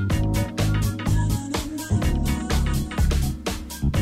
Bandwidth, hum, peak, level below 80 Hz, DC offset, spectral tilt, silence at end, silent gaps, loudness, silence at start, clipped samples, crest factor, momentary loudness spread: 16 kHz; none; -10 dBFS; -26 dBFS; under 0.1%; -5.5 dB/octave; 0 s; none; -24 LUFS; 0 s; under 0.1%; 12 dB; 5 LU